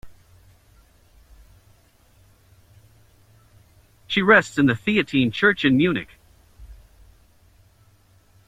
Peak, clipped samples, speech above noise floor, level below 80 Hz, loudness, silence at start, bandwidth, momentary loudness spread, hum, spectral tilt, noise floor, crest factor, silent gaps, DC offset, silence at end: -2 dBFS; under 0.1%; 38 dB; -54 dBFS; -19 LUFS; 0.05 s; 13.5 kHz; 9 LU; none; -6 dB/octave; -56 dBFS; 24 dB; none; under 0.1%; 1.75 s